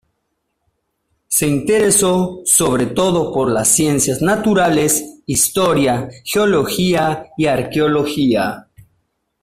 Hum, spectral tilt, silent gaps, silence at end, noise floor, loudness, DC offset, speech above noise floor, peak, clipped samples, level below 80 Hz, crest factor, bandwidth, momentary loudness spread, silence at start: none; -4 dB/octave; none; 0.8 s; -71 dBFS; -15 LUFS; under 0.1%; 56 dB; 0 dBFS; under 0.1%; -46 dBFS; 16 dB; 16 kHz; 6 LU; 1.3 s